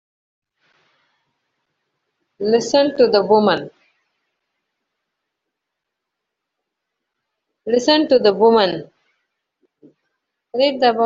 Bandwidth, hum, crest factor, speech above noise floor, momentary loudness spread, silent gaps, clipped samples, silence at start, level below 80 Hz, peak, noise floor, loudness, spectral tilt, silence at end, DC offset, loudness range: 7.8 kHz; none; 18 dB; 65 dB; 14 LU; none; under 0.1%; 2.4 s; -64 dBFS; -2 dBFS; -80 dBFS; -16 LUFS; -2.5 dB/octave; 0 s; under 0.1%; 5 LU